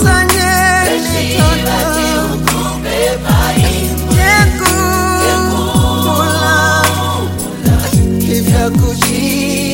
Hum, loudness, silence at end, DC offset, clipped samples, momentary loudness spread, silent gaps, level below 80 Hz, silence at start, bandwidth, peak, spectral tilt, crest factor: none; -12 LUFS; 0 s; under 0.1%; under 0.1%; 5 LU; none; -22 dBFS; 0 s; 17 kHz; 0 dBFS; -4.5 dB/octave; 12 dB